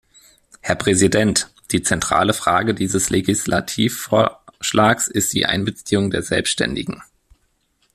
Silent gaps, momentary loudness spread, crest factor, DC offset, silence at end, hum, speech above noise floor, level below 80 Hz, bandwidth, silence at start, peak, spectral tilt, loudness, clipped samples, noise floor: none; 7 LU; 18 dB; under 0.1%; 0.9 s; none; 46 dB; -48 dBFS; 15 kHz; 0.65 s; -2 dBFS; -3.5 dB/octave; -18 LUFS; under 0.1%; -64 dBFS